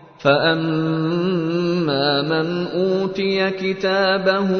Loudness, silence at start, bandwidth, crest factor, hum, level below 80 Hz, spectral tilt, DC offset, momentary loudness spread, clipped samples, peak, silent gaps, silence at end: -19 LUFS; 0.2 s; 6.6 kHz; 16 dB; none; -58 dBFS; -7 dB/octave; under 0.1%; 4 LU; under 0.1%; -4 dBFS; none; 0 s